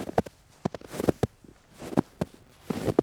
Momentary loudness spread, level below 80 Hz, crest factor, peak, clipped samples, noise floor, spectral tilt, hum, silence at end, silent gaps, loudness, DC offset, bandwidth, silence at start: 9 LU; -52 dBFS; 26 dB; -4 dBFS; under 0.1%; -54 dBFS; -7 dB/octave; none; 0 s; none; -32 LUFS; under 0.1%; over 20 kHz; 0 s